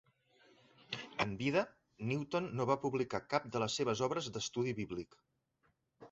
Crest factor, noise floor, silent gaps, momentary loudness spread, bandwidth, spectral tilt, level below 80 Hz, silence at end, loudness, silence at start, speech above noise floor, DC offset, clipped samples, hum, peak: 22 dB; -79 dBFS; none; 10 LU; 8 kHz; -4.5 dB/octave; -68 dBFS; 0.05 s; -38 LUFS; 0.9 s; 42 dB; under 0.1%; under 0.1%; none; -18 dBFS